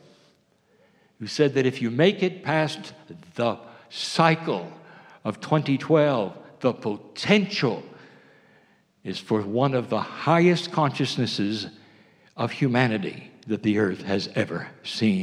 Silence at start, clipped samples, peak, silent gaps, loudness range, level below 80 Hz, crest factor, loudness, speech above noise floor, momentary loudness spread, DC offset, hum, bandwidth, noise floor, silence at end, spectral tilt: 1.2 s; under 0.1%; -2 dBFS; none; 2 LU; -74 dBFS; 22 dB; -24 LUFS; 39 dB; 14 LU; under 0.1%; none; 11.5 kHz; -63 dBFS; 0 s; -6 dB/octave